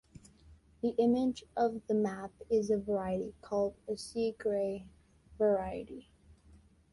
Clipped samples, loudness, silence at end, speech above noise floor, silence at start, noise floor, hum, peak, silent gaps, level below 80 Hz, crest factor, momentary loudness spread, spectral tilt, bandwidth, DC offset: under 0.1%; -34 LUFS; 0.9 s; 29 dB; 0.5 s; -61 dBFS; none; -18 dBFS; none; -62 dBFS; 16 dB; 11 LU; -6.5 dB/octave; 11.5 kHz; under 0.1%